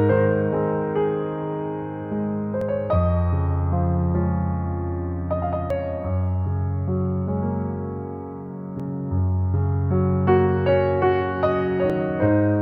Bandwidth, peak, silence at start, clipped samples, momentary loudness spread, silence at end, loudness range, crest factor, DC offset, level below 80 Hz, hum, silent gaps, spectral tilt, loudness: 4.4 kHz; -6 dBFS; 0 s; under 0.1%; 10 LU; 0 s; 5 LU; 16 dB; under 0.1%; -38 dBFS; none; none; -11 dB/octave; -23 LUFS